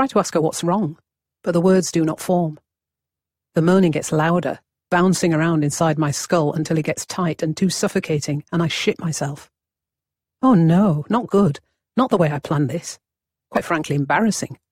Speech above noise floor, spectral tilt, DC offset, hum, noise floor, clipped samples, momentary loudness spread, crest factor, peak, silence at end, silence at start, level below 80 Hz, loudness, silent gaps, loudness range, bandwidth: 68 dB; -5.5 dB/octave; under 0.1%; none; -87 dBFS; under 0.1%; 10 LU; 16 dB; -4 dBFS; 0.2 s; 0 s; -56 dBFS; -20 LUFS; none; 3 LU; 16 kHz